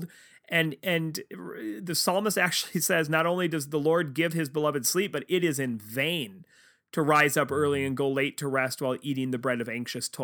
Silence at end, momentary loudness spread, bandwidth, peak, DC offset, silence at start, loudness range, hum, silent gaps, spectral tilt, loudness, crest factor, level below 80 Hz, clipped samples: 0 s; 9 LU; over 20 kHz; -8 dBFS; under 0.1%; 0 s; 2 LU; none; none; -4 dB/octave; -27 LUFS; 20 dB; -72 dBFS; under 0.1%